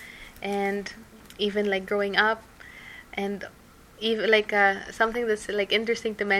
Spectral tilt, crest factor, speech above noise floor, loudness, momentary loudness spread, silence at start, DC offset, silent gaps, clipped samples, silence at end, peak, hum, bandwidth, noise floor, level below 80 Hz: -4 dB/octave; 20 dB; 20 dB; -25 LUFS; 21 LU; 0 s; under 0.1%; none; under 0.1%; 0 s; -6 dBFS; none; 15.5 kHz; -45 dBFS; -56 dBFS